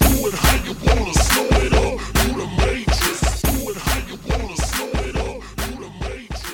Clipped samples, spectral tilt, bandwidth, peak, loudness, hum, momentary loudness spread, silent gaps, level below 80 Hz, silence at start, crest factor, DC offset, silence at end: under 0.1%; -4 dB/octave; 17.5 kHz; -4 dBFS; -20 LUFS; none; 12 LU; none; -24 dBFS; 0 s; 16 dB; under 0.1%; 0 s